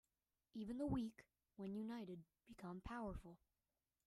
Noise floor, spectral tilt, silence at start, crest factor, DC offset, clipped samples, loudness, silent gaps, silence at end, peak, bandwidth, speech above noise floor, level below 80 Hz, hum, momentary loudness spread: under -90 dBFS; -7.5 dB/octave; 0.55 s; 20 dB; under 0.1%; under 0.1%; -51 LUFS; none; 0.7 s; -32 dBFS; 13.5 kHz; over 40 dB; -66 dBFS; none; 20 LU